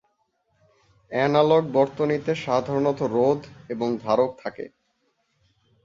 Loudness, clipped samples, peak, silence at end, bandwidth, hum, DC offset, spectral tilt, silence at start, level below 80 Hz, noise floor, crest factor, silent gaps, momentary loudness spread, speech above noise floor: -23 LUFS; under 0.1%; -6 dBFS; 1.15 s; 7.6 kHz; none; under 0.1%; -7 dB/octave; 1.1 s; -62 dBFS; -71 dBFS; 20 dB; none; 15 LU; 48 dB